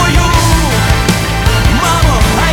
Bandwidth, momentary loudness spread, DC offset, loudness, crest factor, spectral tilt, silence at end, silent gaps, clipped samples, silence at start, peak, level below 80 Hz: 19 kHz; 2 LU; under 0.1%; -10 LUFS; 10 dB; -4.5 dB/octave; 0 s; none; under 0.1%; 0 s; 0 dBFS; -14 dBFS